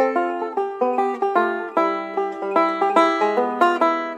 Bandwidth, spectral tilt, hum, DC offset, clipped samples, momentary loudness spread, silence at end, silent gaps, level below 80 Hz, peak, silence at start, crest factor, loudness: 10 kHz; -5 dB/octave; none; under 0.1%; under 0.1%; 7 LU; 0 s; none; -80 dBFS; -4 dBFS; 0 s; 16 dB; -20 LUFS